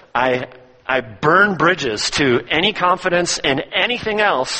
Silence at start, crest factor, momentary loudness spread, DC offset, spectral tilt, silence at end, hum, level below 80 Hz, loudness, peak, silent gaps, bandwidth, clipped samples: 0.15 s; 18 dB; 8 LU; under 0.1%; -3.5 dB/octave; 0 s; none; -48 dBFS; -17 LUFS; 0 dBFS; none; 8.8 kHz; under 0.1%